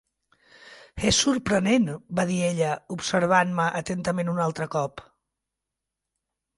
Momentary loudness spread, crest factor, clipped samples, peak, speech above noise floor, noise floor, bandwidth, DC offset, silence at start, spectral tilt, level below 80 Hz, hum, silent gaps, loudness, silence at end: 8 LU; 20 dB; under 0.1%; -6 dBFS; 61 dB; -86 dBFS; 11.5 kHz; under 0.1%; 0.65 s; -4.5 dB/octave; -52 dBFS; none; none; -24 LUFS; 1.55 s